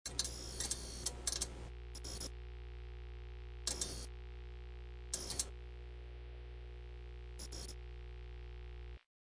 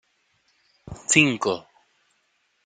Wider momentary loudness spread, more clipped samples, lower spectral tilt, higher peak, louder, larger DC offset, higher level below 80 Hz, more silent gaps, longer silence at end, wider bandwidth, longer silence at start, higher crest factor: second, 13 LU vs 19 LU; neither; about the same, -2 dB/octave vs -3 dB/octave; second, -20 dBFS vs -2 dBFS; second, -45 LUFS vs -20 LUFS; neither; first, -50 dBFS vs -58 dBFS; neither; second, 0.35 s vs 1.05 s; about the same, 10.5 kHz vs 9.6 kHz; second, 0.05 s vs 0.9 s; about the same, 26 dB vs 24 dB